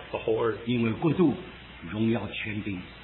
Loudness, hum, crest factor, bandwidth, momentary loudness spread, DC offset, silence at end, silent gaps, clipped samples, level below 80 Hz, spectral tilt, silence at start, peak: -28 LUFS; none; 16 dB; 4.2 kHz; 12 LU; under 0.1%; 0 s; none; under 0.1%; -54 dBFS; -11 dB/octave; 0 s; -12 dBFS